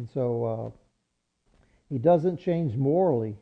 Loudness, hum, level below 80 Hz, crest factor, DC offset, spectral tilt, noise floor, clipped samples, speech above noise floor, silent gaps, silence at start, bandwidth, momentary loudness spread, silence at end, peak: -26 LUFS; none; -62 dBFS; 18 dB; under 0.1%; -11 dB/octave; -77 dBFS; under 0.1%; 52 dB; none; 0 s; 6 kHz; 13 LU; 0.05 s; -10 dBFS